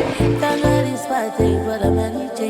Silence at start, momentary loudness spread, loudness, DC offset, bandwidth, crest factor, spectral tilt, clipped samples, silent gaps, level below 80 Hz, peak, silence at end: 0 s; 5 LU; -19 LUFS; under 0.1%; 16.5 kHz; 16 dB; -6.5 dB/octave; under 0.1%; none; -34 dBFS; -2 dBFS; 0 s